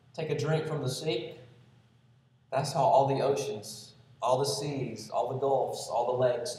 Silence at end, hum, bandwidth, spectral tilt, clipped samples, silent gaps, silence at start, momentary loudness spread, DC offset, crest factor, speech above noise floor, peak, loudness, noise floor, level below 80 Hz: 0 s; none; 14.5 kHz; -5 dB/octave; under 0.1%; none; 0.15 s; 11 LU; under 0.1%; 18 dB; 34 dB; -12 dBFS; -30 LUFS; -63 dBFS; -72 dBFS